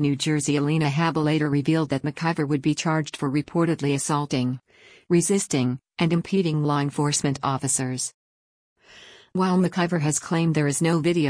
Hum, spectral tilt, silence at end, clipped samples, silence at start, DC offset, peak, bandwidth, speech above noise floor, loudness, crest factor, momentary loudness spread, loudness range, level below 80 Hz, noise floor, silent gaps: none; -5 dB/octave; 0 s; under 0.1%; 0 s; under 0.1%; -10 dBFS; 10.5 kHz; 26 dB; -23 LUFS; 14 dB; 4 LU; 2 LU; -60 dBFS; -49 dBFS; 8.14-8.76 s